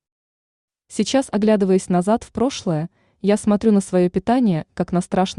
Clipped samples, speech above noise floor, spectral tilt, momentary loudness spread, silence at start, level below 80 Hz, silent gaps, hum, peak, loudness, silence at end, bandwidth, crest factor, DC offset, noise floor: under 0.1%; over 72 dB; -6.5 dB/octave; 7 LU; 0.9 s; -52 dBFS; none; none; -4 dBFS; -19 LUFS; 0.05 s; 11 kHz; 14 dB; under 0.1%; under -90 dBFS